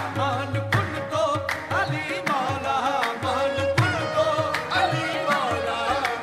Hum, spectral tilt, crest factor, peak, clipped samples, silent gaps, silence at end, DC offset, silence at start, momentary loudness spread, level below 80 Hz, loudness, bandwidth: none; -5 dB/octave; 18 dB; -6 dBFS; under 0.1%; none; 0 s; under 0.1%; 0 s; 3 LU; -54 dBFS; -24 LUFS; 16 kHz